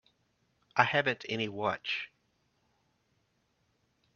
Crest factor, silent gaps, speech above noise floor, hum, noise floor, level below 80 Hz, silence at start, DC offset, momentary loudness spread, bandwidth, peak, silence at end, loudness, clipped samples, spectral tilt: 30 dB; none; 44 dB; none; -76 dBFS; -76 dBFS; 0.75 s; under 0.1%; 9 LU; 7 kHz; -6 dBFS; 2.1 s; -31 LUFS; under 0.1%; -2 dB/octave